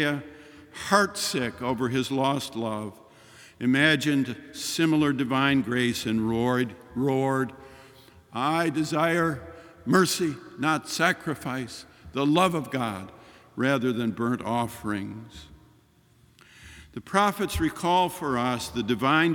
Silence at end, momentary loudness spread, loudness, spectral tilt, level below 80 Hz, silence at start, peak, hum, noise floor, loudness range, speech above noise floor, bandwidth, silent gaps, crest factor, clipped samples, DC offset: 0 s; 15 LU; -26 LUFS; -4.5 dB/octave; -56 dBFS; 0 s; -4 dBFS; none; -60 dBFS; 5 LU; 34 dB; 19 kHz; none; 22 dB; under 0.1%; under 0.1%